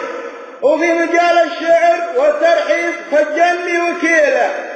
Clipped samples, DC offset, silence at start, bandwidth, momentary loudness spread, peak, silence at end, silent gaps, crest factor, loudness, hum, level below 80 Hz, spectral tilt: under 0.1%; under 0.1%; 0 s; 9 kHz; 5 LU; -2 dBFS; 0 s; none; 12 dB; -13 LUFS; none; -64 dBFS; -2 dB/octave